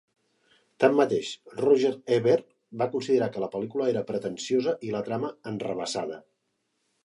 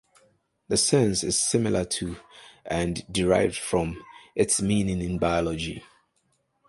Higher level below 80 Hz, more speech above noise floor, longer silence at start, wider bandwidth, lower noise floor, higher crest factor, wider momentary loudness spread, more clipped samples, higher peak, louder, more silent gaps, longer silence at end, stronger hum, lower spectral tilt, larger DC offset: second, -72 dBFS vs -46 dBFS; about the same, 50 dB vs 47 dB; about the same, 0.8 s vs 0.7 s; about the same, 11.5 kHz vs 12 kHz; first, -77 dBFS vs -71 dBFS; about the same, 22 dB vs 20 dB; about the same, 11 LU vs 13 LU; neither; about the same, -6 dBFS vs -6 dBFS; about the same, -27 LUFS vs -25 LUFS; neither; about the same, 0.85 s vs 0.85 s; neither; first, -5.5 dB/octave vs -4 dB/octave; neither